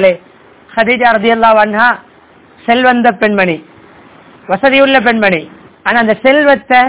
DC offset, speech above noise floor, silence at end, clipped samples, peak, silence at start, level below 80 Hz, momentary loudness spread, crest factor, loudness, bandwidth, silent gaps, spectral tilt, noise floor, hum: 0.3%; 33 dB; 0 s; 2%; 0 dBFS; 0 s; -48 dBFS; 11 LU; 10 dB; -10 LUFS; 4 kHz; none; -8.5 dB/octave; -42 dBFS; none